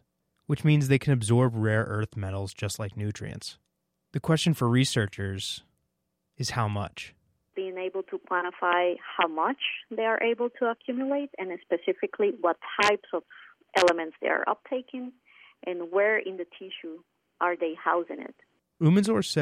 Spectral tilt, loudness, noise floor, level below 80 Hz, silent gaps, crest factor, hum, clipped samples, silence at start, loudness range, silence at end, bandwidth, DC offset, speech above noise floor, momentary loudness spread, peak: -5.5 dB/octave; -27 LUFS; -79 dBFS; -64 dBFS; none; 20 dB; none; under 0.1%; 0.5 s; 4 LU; 0 s; 15.5 kHz; under 0.1%; 52 dB; 15 LU; -8 dBFS